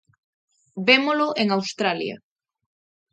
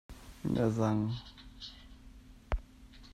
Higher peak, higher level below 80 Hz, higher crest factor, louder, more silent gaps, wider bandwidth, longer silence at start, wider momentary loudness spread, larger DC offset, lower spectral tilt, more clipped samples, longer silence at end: first, -2 dBFS vs -16 dBFS; second, -74 dBFS vs -48 dBFS; about the same, 22 dB vs 20 dB; first, -21 LUFS vs -34 LUFS; neither; second, 9 kHz vs 13.5 kHz; first, 0.75 s vs 0.1 s; second, 18 LU vs 25 LU; neither; second, -4 dB/octave vs -7.5 dB/octave; neither; first, 0.95 s vs 0 s